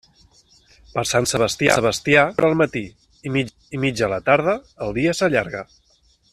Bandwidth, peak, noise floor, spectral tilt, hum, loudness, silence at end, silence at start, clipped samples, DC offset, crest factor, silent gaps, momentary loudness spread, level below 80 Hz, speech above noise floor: 14 kHz; 0 dBFS; -59 dBFS; -4.5 dB/octave; none; -20 LUFS; 0.7 s; 0.95 s; under 0.1%; under 0.1%; 20 dB; none; 13 LU; -50 dBFS; 39 dB